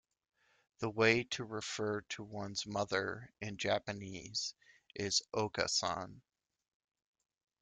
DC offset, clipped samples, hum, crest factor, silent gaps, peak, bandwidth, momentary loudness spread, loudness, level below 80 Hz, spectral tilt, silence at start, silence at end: under 0.1%; under 0.1%; none; 24 dB; none; -16 dBFS; 10 kHz; 13 LU; -37 LUFS; -72 dBFS; -3 dB/octave; 0.8 s; 1.45 s